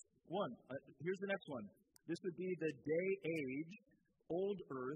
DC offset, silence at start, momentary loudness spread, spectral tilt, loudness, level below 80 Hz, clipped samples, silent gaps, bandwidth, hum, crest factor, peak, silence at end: under 0.1%; 0.25 s; 12 LU; -7 dB/octave; -44 LUFS; -84 dBFS; under 0.1%; none; 11 kHz; none; 16 dB; -28 dBFS; 0 s